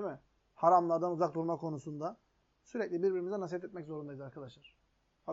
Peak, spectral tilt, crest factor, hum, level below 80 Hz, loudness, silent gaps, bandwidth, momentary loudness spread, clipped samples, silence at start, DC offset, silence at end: -14 dBFS; -7 dB/octave; 22 dB; none; -76 dBFS; -34 LUFS; none; 7.6 kHz; 20 LU; under 0.1%; 0 s; under 0.1%; 0 s